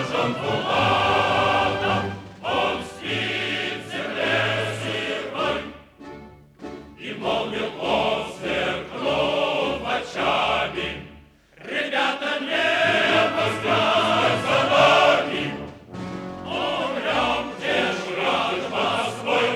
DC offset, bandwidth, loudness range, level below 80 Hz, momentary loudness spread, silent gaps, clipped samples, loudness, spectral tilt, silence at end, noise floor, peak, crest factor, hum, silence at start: under 0.1%; 19 kHz; 8 LU; -52 dBFS; 14 LU; none; under 0.1%; -22 LUFS; -4 dB/octave; 0 s; -49 dBFS; -4 dBFS; 18 dB; none; 0 s